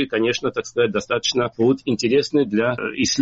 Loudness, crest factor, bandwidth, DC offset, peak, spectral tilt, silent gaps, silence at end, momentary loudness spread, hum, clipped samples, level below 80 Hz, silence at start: -20 LUFS; 12 dB; 8 kHz; under 0.1%; -8 dBFS; -3.5 dB/octave; none; 0 s; 3 LU; none; under 0.1%; -54 dBFS; 0 s